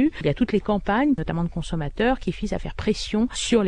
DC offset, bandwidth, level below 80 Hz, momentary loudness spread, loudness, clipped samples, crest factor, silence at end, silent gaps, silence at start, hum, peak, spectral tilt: under 0.1%; 10.5 kHz; -36 dBFS; 7 LU; -24 LUFS; under 0.1%; 16 dB; 0 s; none; 0 s; none; -8 dBFS; -5.5 dB/octave